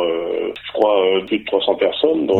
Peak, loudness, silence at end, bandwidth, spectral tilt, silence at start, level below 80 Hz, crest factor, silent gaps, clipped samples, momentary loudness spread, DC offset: -2 dBFS; -18 LUFS; 0 s; 4.3 kHz; -6.5 dB/octave; 0 s; -58 dBFS; 16 dB; none; under 0.1%; 8 LU; under 0.1%